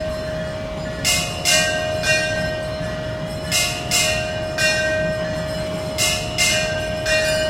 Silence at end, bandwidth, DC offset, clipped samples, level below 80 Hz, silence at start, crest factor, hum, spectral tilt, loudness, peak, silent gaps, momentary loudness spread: 0 s; 16.5 kHz; under 0.1%; under 0.1%; -38 dBFS; 0 s; 18 dB; none; -2.5 dB/octave; -20 LUFS; -4 dBFS; none; 10 LU